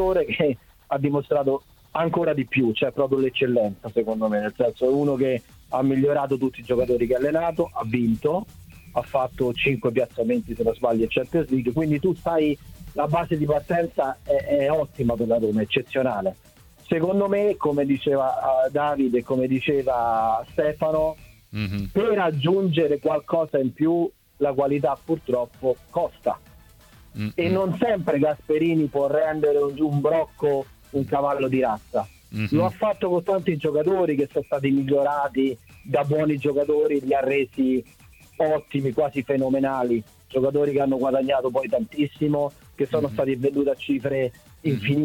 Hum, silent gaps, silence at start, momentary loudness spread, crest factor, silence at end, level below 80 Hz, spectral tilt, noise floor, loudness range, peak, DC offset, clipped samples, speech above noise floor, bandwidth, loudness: none; none; 0 s; 6 LU; 16 dB; 0 s; -50 dBFS; -8 dB/octave; -50 dBFS; 2 LU; -6 dBFS; under 0.1%; under 0.1%; 28 dB; 18 kHz; -23 LUFS